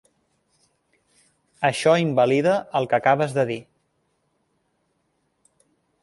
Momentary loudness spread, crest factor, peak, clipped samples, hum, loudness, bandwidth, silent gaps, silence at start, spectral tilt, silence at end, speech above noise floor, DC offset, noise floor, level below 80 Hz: 6 LU; 20 dB; -4 dBFS; under 0.1%; none; -21 LUFS; 11.5 kHz; none; 1.6 s; -5.5 dB/octave; 2.4 s; 51 dB; under 0.1%; -71 dBFS; -68 dBFS